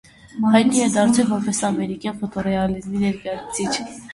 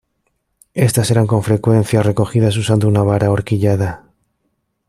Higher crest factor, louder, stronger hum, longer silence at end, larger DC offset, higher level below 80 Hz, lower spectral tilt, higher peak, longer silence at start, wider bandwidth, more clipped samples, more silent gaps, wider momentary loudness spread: first, 20 dB vs 14 dB; second, -20 LUFS vs -15 LUFS; neither; second, 0 s vs 0.9 s; neither; about the same, -50 dBFS vs -46 dBFS; second, -4.5 dB/octave vs -6.5 dB/octave; about the same, -2 dBFS vs -2 dBFS; second, 0.35 s vs 0.75 s; second, 11.5 kHz vs 14.5 kHz; neither; neither; first, 11 LU vs 5 LU